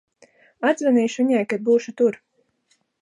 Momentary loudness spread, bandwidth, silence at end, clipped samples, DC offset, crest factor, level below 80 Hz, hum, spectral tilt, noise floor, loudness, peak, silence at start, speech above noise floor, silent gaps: 4 LU; 11 kHz; 0.85 s; under 0.1%; under 0.1%; 16 dB; -76 dBFS; none; -5 dB/octave; -67 dBFS; -21 LUFS; -6 dBFS; 0.6 s; 48 dB; none